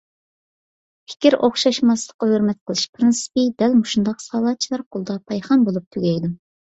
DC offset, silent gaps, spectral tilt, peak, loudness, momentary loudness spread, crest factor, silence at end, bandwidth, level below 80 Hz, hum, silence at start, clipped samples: under 0.1%; 2.14-2.19 s, 2.61-2.66 s, 2.89-2.93 s, 4.86-4.91 s, 5.87-5.91 s; -5 dB/octave; -2 dBFS; -19 LUFS; 10 LU; 18 dB; 0.3 s; 8.2 kHz; -60 dBFS; none; 1.1 s; under 0.1%